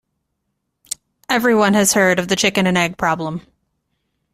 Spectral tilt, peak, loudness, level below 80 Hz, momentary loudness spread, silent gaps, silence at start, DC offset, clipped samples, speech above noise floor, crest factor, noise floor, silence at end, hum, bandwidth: -3.5 dB/octave; -2 dBFS; -16 LUFS; -54 dBFS; 17 LU; none; 1.3 s; under 0.1%; under 0.1%; 58 dB; 18 dB; -74 dBFS; 0.95 s; none; 16 kHz